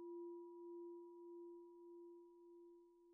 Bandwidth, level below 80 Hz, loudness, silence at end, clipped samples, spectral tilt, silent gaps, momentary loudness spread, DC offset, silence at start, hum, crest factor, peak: 1.1 kHz; under -90 dBFS; -58 LUFS; 0 s; under 0.1%; 7 dB/octave; none; 11 LU; under 0.1%; 0 s; none; 10 dB; -48 dBFS